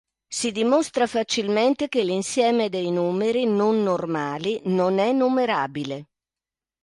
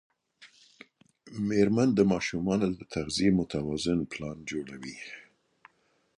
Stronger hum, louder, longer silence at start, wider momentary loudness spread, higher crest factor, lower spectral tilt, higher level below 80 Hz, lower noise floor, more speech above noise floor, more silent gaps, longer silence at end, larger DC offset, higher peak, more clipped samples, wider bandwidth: neither; first, -23 LUFS vs -28 LUFS; about the same, 0.3 s vs 0.4 s; second, 6 LU vs 17 LU; about the same, 16 dB vs 20 dB; second, -4.5 dB/octave vs -6 dB/octave; second, -68 dBFS vs -56 dBFS; first, under -90 dBFS vs -68 dBFS; first, over 68 dB vs 40 dB; neither; second, 0.8 s vs 1 s; neither; about the same, -8 dBFS vs -10 dBFS; neither; about the same, 11.5 kHz vs 11.5 kHz